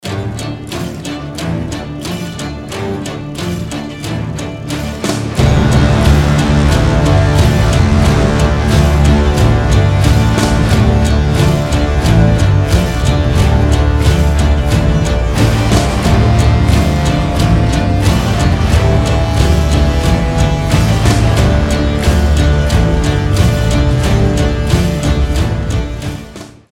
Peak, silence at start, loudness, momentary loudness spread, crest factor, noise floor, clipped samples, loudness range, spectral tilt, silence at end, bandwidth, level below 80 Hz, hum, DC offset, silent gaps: 0 dBFS; 0.05 s; -12 LUFS; 11 LU; 10 dB; -31 dBFS; under 0.1%; 9 LU; -6 dB/octave; 0.25 s; 15.5 kHz; -16 dBFS; none; under 0.1%; none